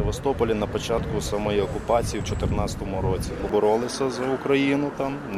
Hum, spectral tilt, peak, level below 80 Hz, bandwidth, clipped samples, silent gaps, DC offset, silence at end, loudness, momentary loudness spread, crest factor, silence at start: none; -5.5 dB/octave; -8 dBFS; -36 dBFS; 15 kHz; under 0.1%; none; under 0.1%; 0 s; -25 LUFS; 6 LU; 16 dB; 0 s